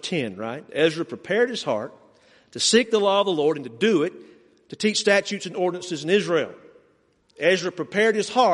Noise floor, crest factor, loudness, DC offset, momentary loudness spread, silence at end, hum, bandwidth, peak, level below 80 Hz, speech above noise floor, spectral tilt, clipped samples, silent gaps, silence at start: -63 dBFS; 20 dB; -22 LUFS; under 0.1%; 11 LU; 0 s; none; 11.5 kHz; -4 dBFS; -70 dBFS; 40 dB; -3.5 dB/octave; under 0.1%; none; 0.05 s